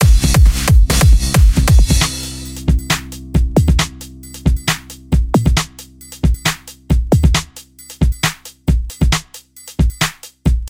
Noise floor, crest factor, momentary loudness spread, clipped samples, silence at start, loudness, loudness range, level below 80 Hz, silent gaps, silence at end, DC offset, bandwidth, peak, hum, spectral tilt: -38 dBFS; 14 dB; 17 LU; under 0.1%; 0 s; -15 LUFS; 5 LU; -16 dBFS; none; 0 s; under 0.1%; 16.5 kHz; 0 dBFS; none; -4.5 dB/octave